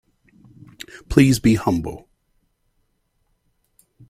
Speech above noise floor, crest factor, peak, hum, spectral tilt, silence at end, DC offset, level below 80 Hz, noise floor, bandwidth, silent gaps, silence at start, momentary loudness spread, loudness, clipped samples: 51 dB; 22 dB; 0 dBFS; none; -6 dB/octave; 2.1 s; under 0.1%; -42 dBFS; -68 dBFS; 16 kHz; none; 1.1 s; 24 LU; -18 LUFS; under 0.1%